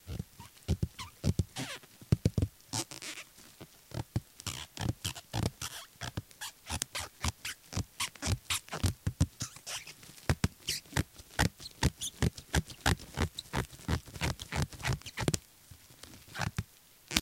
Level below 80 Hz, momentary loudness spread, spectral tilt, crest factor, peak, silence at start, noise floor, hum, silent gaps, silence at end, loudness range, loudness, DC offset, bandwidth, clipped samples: -46 dBFS; 13 LU; -4 dB/octave; 34 dB; -4 dBFS; 0.05 s; -57 dBFS; none; none; 0 s; 5 LU; -36 LUFS; under 0.1%; 17 kHz; under 0.1%